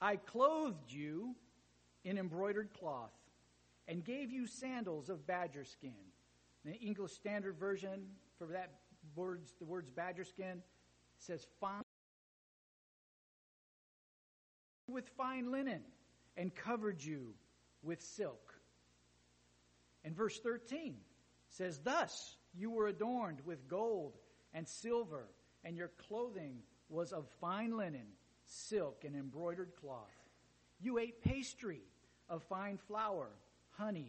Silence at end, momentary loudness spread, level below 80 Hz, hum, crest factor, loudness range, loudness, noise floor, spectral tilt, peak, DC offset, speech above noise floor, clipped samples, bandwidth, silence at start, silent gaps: 0 s; 15 LU; -70 dBFS; 60 Hz at -75 dBFS; 24 dB; 7 LU; -44 LUFS; -73 dBFS; -5.5 dB/octave; -20 dBFS; under 0.1%; 30 dB; under 0.1%; 8.4 kHz; 0 s; 11.83-14.88 s